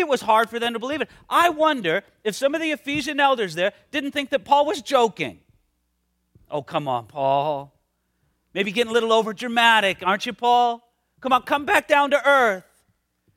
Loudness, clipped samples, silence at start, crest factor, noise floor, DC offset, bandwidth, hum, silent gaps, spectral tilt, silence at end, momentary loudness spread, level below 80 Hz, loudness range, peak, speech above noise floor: -21 LUFS; under 0.1%; 0 s; 20 dB; -72 dBFS; under 0.1%; 16.5 kHz; none; none; -3.5 dB/octave; 0.75 s; 11 LU; -64 dBFS; 6 LU; -2 dBFS; 50 dB